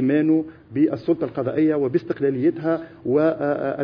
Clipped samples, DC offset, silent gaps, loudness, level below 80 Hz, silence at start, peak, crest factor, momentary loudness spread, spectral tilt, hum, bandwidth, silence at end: under 0.1%; under 0.1%; none; -22 LUFS; -60 dBFS; 0 s; -8 dBFS; 14 dB; 5 LU; -10.5 dB/octave; none; 5.4 kHz; 0 s